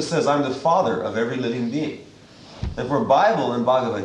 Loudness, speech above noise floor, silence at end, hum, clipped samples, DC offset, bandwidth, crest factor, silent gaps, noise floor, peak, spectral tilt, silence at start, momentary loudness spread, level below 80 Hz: -21 LUFS; 24 dB; 0 s; none; under 0.1%; under 0.1%; 10.5 kHz; 16 dB; none; -45 dBFS; -4 dBFS; -6 dB/octave; 0 s; 13 LU; -44 dBFS